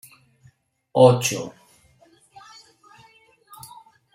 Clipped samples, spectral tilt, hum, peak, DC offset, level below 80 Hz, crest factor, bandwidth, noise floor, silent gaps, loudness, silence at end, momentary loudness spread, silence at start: under 0.1%; -5 dB/octave; none; -2 dBFS; under 0.1%; -66 dBFS; 22 dB; 16 kHz; -58 dBFS; none; -18 LUFS; 2.65 s; 28 LU; 0.95 s